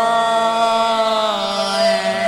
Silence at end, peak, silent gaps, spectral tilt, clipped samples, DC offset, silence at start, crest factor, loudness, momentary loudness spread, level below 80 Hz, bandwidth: 0 s; -4 dBFS; none; -3 dB/octave; under 0.1%; under 0.1%; 0 s; 12 dB; -16 LUFS; 3 LU; -56 dBFS; 14 kHz